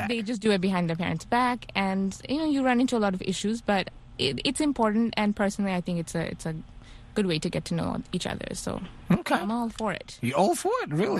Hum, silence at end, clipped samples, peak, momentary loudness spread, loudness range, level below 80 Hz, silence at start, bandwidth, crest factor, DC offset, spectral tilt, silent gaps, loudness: none; 0 s; under 0.1%; -8 dBFS; 8 LU; 4 LU; -50 dBFS; 0 s; 12.5 kHz; 18 dB; under 0.1%; -5 dB/octave; none; -27 LUFS